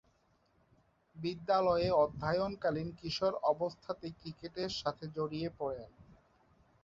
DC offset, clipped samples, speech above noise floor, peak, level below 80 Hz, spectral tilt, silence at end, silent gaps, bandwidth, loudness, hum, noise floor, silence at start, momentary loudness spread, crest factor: under 0.1%; under 0.1%; 38 dB; -18 dBFS; -62 dBFS; -4.5 dB/octave; 0.8 s; none; 7.8 kHz; -35 LUFS; none; -72 dBFS; 1.15 s; 13 LU; 18 dB